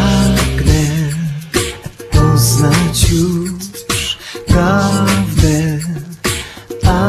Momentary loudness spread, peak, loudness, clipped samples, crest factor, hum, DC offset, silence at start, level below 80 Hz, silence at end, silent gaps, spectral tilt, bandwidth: 11 LU; 0 dBFS; -14 LUFS; under 0.1%; 14 dB; none; under 0.1%; 0 s; -22 dBFS; 0 s; none; -5 dB/octave; 14.5 kHz